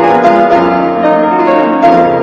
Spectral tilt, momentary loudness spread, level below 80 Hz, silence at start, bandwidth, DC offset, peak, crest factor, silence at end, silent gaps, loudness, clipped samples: -7.5 dB/octave; 3 LU; -44 dBFS; 0 s; 7.6 kHz; under 0.1%; 0 dBFS; 8 dB; 0 s; none; -8 LUFS; 1%